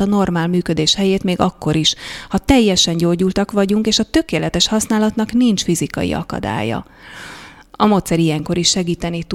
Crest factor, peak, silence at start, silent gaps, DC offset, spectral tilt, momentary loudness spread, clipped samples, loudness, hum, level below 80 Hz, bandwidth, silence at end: 16 dB; 0 dBFS; 0 s; none; under 0.1%; -4.5 dB/octave; 9 LU; under 0.1%; -16 LUFS; none; -38 dBFS; 15.5 kHz; 0 s